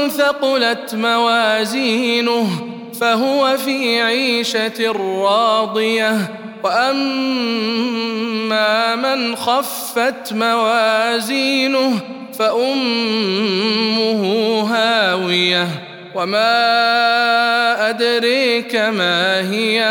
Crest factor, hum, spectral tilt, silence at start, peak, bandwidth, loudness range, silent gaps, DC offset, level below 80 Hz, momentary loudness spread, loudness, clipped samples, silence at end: 14 dB; none; -3.5 dB/octave; 0 s; -2 dBFS; 18 kHz; 3 LU; none; under 0.1%; -72 dBFS; 6 LU; -16 LUFS; under 0.1%; 0 s